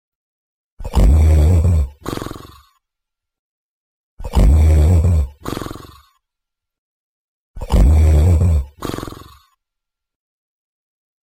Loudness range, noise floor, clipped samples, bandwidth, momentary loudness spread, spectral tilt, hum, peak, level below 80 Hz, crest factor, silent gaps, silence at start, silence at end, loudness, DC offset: 3 LU; -82 dBFS; under 0.1%; 15.5 kHz; 20 LU; -7.5 dB/octave; none; -4 dBFS; -18 dBFS; 12 dB; 3.39-4.17 s, 6.78-7.54 s; 0.8 s; 2.1 s; -15 LUFS; under 0.1%